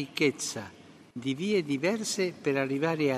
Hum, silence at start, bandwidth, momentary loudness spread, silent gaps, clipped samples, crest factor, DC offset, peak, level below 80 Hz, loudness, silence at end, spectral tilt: none; 0 s; 14 kHz; 11 LU; none; under 0.1%; 18 dB; under 0.1%; -12 dBFS; -76 dBFS; -29 LUFS; 0 s; -4.5 dB/octave